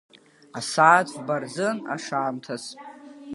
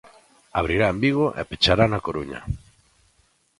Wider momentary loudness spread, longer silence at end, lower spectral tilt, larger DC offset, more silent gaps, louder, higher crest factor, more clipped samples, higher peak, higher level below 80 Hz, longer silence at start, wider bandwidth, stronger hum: first, 23 LU vs 14 LU; second, 0 s vs 1 s; second, -4 dB/octave vs -6 dB/octave; neither; neither; about the same, -23 LUFS vs -22 LUFS; about the same, 22 dB vs 22 dB; neither; about the same, -2 dBFS vs -2 dBFS; second, -78 dBFS vs -40 dBFS; about the same, 0.55 s vs 0.55 s; about the same, 11.5 kHz vs 11.5 kHz; neither